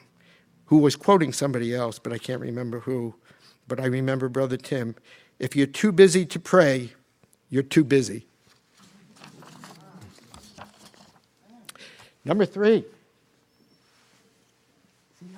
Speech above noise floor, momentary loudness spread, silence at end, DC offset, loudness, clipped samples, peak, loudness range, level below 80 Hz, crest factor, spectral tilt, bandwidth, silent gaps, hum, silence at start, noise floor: 42 dB; 16 LU; 0 s; under 0.1%; -23 LUFS; under 0.1%; 0 dBFS; 8 LU; -68 dBFS; 24 dB; -6 dB/octave; 16 kHz; none; none; 0.7 s; -64 dBFS